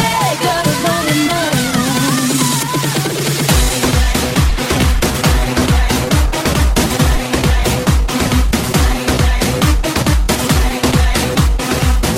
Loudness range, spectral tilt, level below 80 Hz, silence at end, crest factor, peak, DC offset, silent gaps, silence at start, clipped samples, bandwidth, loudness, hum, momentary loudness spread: 0 LU; -4.5 dB/octave; -18 dBFS; 0 s; 12 dB; 0 dBFS; under 0.1%; none; 0 s; under 0.1%; 16.5 kHz; -14 LUFS; none; 2 LU